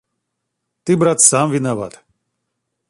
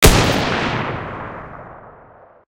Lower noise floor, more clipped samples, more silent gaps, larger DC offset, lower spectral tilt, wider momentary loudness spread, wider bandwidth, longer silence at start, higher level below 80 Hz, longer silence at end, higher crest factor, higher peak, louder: first, -76 dBFS vs -46 dBFS; second, under 0.1% vs 0.1%; neither; neither; about the same, -4 dB/octave vs -4 dB/octave; second, 17 LU vs 23 LU; about the same, 16 kHz vs 16.5 kHz; first, 0.85 s vs 0 s; second, -60 dBFS vs -24 dBFS; first, 1 s vs 0.65 s; about the same, 18 dB vs 18 dB; about the same, 0 dBFS vs 0 dBFS; first, -14 LUFS vs -18 LUFS